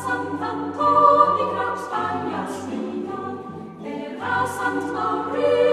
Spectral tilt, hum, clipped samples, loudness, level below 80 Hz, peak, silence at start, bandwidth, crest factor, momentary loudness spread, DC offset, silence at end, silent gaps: -5.5 dB/octave; none; under 0.1%; -22 LUFS; -68 dBFS; -2 dBFS; 0 s; 14 kHz; 20 dB; 16 LU; under 0.1%; 0 s; none